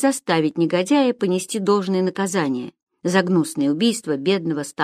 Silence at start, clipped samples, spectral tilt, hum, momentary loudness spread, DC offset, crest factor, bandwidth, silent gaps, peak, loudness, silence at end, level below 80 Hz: 0 s; under 0.1%; -5 dB/octave; none; 6 LU; under 0.1%; 18 dB; 14.5 kHz; 2.82-2.87 s; -2 dBFS; -20 LUFS; 0 s; -68 dBFS